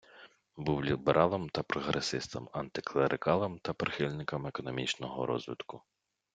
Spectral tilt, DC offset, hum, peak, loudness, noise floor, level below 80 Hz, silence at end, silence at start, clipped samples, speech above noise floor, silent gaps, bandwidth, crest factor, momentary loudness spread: -5.5 dB/octave; under 0.1%; none; -10 dBFS; -33 LUFS; -58 dBFS; -62 dBFS; 0.55 s; 0.15 s; under 0.1%; 25 dB; none; 9.4 kHz; 24 dB; 11 LU